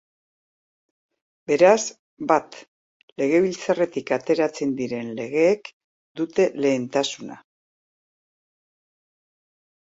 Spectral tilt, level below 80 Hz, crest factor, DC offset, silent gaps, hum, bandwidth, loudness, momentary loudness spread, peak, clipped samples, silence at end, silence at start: -4.5 dB/octave; -70 dBFS; 22 dB; under 0.1%; 1.99-2.17 s, 2.68-3.16 s, 5.73-6.15 s; none; 8 kHz; -22 LUFS; 19 LU; -4 dBFS; under 0.1%; 2.55 s; 1.5 s